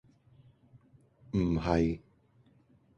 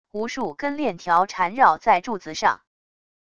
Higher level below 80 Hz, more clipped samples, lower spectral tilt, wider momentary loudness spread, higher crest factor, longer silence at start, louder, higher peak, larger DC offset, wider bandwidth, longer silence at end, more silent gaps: first, -48 dBFS vs -60 dBFS; neither; first, -8 dB/octave vs -4 dB/octave; second, 8 LU vs 11 LU; about the same, 24 dB vs 20 dB; first, 1.35 s vs 0.15 s; second, -31 LUFS vs -22 LUFS; second, -12 dBFS vs -2 dBFS; second, under 0.1% vs 0.5%; second, 8.2 kHz vs 9.4 kHz; first, 1 s vs 0.8 s; neither